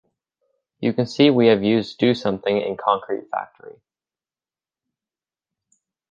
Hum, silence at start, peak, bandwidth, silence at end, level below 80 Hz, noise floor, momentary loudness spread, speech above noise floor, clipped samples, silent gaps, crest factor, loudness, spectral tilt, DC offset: none; 0.8 s; -2 dBFS; 7.6 kHz; 2.4 s; -62 dBFS; under -90 dBFS; 12 LU; over 70 dB; under 0.1%; none; 20 dB; -20 LUFS; -7 dB/octave; under 0.1%